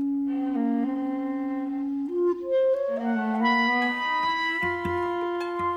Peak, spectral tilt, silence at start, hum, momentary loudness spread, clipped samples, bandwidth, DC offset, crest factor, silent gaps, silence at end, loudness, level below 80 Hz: -12 dBFS; -6 dB/octave; 0 s; none; 7 LU; under 0.1%; 9.2 kHz; under 0.1%; 14 dB; none; 0 s; -26 LUFS; -60 dBFS